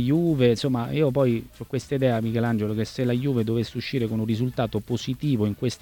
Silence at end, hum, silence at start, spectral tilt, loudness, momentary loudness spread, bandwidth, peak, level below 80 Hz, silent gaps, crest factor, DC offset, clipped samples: 0.05 s; none; 0 s; -7.5 dB/octave; -25 LUFS; 7 LU; 18 kHz; -8 dBFS; -52 dBFS; none; 16 dB; under 0.1%; under 0.1%